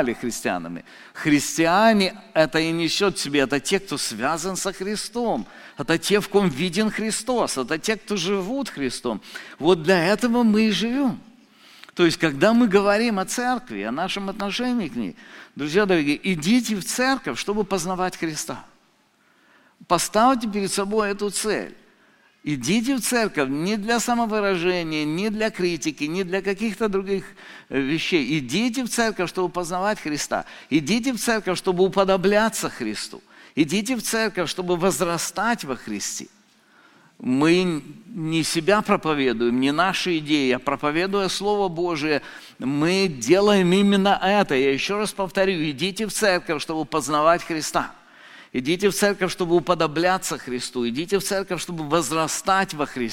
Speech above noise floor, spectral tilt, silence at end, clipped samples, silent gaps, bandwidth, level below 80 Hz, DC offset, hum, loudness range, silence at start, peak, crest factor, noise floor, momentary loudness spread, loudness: 39 dB; -4 dB/octave; 0 s; under 0.1%; none; 17 kHz; -52 dBFS; under 0.1%; none; 4 LU; 0 s; -2 dBFS; 20 dB; -61 dBFS; 10 LU; -22 LUFS